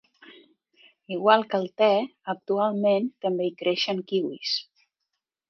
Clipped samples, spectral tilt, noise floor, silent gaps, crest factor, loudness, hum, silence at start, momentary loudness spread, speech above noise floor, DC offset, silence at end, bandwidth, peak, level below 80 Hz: under 0.1%; -5.5 dB/octave; -83 dBFS; none; 24 dB; -25 LUFS; none; 0.3 s; 8 LU; 58 dB; under 0.1%; 0.85 s; 6.6 kHz; -4 dBFS; -80 dBFS